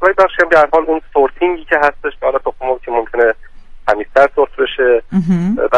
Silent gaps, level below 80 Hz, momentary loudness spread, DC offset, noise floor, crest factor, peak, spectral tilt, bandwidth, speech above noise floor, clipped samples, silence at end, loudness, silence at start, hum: none; -36 dBFS; 8 LU; under 0.1%; -32 dBFS; 14 dB; 0 dBFS; -7 dB/octave; 9.8 kHz; 19 dB; under 0.1%; 0 s; -14 LUFS; 0 s; none